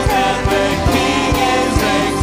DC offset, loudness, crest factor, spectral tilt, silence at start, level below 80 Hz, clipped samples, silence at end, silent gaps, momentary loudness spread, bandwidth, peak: under 0.1%; -15 LUFS; 12 dB; -4.5 dB/octave; 0 s; -26 dBFS; under 0.1%; 0 s; none; 1 LU; 16 kHz; -4 dBFS